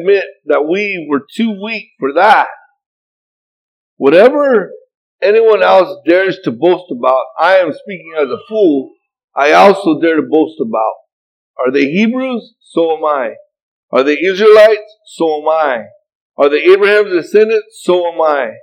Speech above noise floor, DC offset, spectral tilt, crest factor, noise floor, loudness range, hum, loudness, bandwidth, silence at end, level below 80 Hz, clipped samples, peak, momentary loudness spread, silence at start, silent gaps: over 79 dB; under 0.1%; -5.5 dB/octave; 12 dB; under -90 dBFS; 4 LU; none; -11 LUFS; 10.5 kHz; 0.1 s; -66 dBFS; 0.5%; 0 dBFS; 11 LU; 0 s; 2.86-3.97 s, 4.95-5.19 s, 9.24-9.28 s, 11.13-11.54 s, 13.62-13.88 s, 16.15-16.32 s